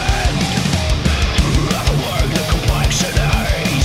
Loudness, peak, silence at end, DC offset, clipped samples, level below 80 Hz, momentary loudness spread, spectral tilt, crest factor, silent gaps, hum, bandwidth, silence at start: -16 LUFS; -2 dBFS; 0 s; under 0.1%; under 0.1%; -20 dBFS; 2 LU; -4.5 dB/octave; 14 dB; none; none; 16 kHz; 0 s